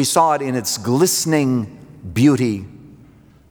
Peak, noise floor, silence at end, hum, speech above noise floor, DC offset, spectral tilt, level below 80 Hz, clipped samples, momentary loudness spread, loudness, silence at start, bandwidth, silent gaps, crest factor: -2 dBFS; -47 dBFS; 0.55 s; none; 30 dB; under 0.1%; -4.5 dB/octave; -54 dBFS; under 0.1%; 15 LU; -17 LUFS; 0 s; over 20 kHz; none; 16 dB